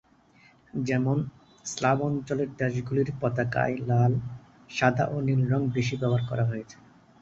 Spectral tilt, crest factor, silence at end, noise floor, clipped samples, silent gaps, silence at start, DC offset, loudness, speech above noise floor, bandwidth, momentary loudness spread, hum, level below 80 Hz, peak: -6.5 dB/octave; 22 dB; 0.45 s; -59 dBFS; under 0.1%; none; 0.75 s; under 0.1%; -27 LUFS; 33 dB; 7.8 kHz; 13 LU; none; -56 dBFS; -6 dBFS